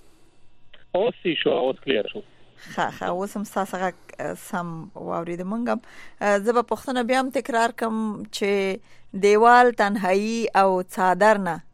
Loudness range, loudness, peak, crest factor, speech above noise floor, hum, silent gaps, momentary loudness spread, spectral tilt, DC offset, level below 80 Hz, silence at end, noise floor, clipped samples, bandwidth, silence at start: 9 LU; -22 LUFS; -2 dBFS; 20 dB; 25 dB; none; none; 13 LU; -5 dB/octave; under 0.1%; -60 dBFS; 0.05 s; -47 dBFS; under 0.1%; 15.5 kHz; 0.05 s